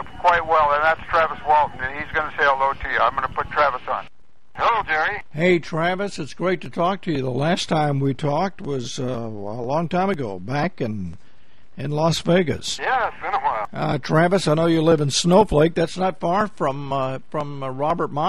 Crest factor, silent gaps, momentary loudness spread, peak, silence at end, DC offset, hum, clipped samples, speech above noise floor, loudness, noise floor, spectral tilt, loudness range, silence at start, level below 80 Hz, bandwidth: 18 dB; none; 10 LU; -4 dBFS; 0 s; 2%; none; under 0.1%; 35 dB; -21 LUFS; -56 dBFS; -5.5 dB/octave; 5 LU; 0 s; -46 dBFS; 13 kHz